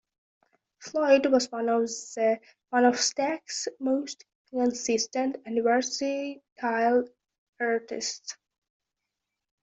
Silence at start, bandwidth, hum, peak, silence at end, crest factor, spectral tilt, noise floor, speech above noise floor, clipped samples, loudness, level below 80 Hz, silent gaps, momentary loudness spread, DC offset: 0.8 s; 8.2 kHz; none; -8 dBFS; 1.3 s; 20 dB; -2 dB/octave; -86 dBFS; 59 dB; under 0.1%; -27 LUFS; -74 dBFS; 4.35-4.45 s, 6.52-6.56 s, 7.38-7.53 s; 14 LU; under 0.1%